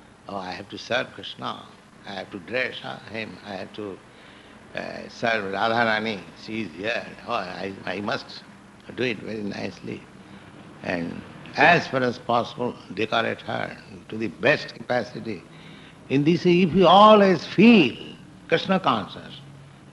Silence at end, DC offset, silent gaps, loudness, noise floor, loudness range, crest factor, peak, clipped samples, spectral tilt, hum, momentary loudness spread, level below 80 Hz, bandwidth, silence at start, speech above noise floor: 0.3 s; under 0.1%; none; -22 LUFS; -47 dBFS; 14 LU; 20 dB; -4 dBFS; under 0.1%; -6 dB/octave; none; 20 LU; -60 dBFS; 11 kHz; 0.3 s; 24 dB